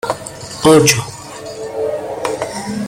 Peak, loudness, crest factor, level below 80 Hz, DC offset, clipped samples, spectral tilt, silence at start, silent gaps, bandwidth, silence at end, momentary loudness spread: 0 dBFS; -15 LUFS; 16 dB; -48 dBFS; under 0.1%; under 0.1%; -4 dB/octave; 0.05 s; none; 16.5 kHz; 0 s; 19 LU